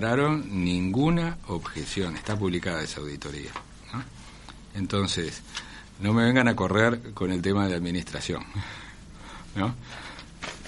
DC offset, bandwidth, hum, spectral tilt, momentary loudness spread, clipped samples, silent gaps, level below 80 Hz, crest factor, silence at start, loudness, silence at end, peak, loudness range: under 0.1%; 11.5 kHz; none; -5.5 dB/octave; 19 LU; under 0.1%; none; -48 dBFS; 22 dB; 0 s; -27 LUFS; 0 s; -6 dBFS; 7 LU